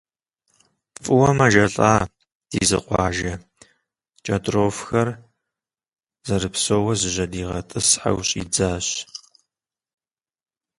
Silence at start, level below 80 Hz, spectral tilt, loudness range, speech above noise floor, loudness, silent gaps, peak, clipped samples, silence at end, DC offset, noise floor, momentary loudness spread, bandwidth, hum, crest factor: 1 s; -44 dBFS; -4 dB/octave; 5 LU; 66 dB; -20 LUFS; 2.35-2.41 s; 0 dBFS; under 0.1%; 1.6 s; under 0.1%; -86 dBFS; 15 LU; 11.5 kHz; none; 22 dB